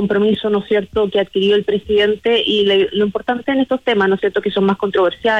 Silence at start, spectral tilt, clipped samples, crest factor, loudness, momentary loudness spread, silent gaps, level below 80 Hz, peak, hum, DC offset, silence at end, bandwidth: 0 s; -6.5 dB/octave; under 0.1%; 12 dB; -16 LUFS; 4 LU; none; -48 dBFS; -4 dBFS; none; under 0.1%; 0 s; 7 kHz